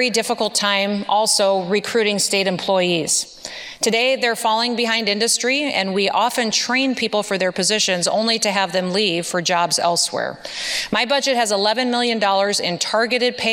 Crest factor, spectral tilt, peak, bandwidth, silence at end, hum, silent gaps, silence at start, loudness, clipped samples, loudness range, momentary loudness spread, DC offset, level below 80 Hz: 16 dB; -2 dB/octave; -2 dBFS; 17 kHz; 0 s; none; none; 0 s; -18 LUFS; under 0.1%; 1 LU; 4 LU; under 0.1%; -62 dBFS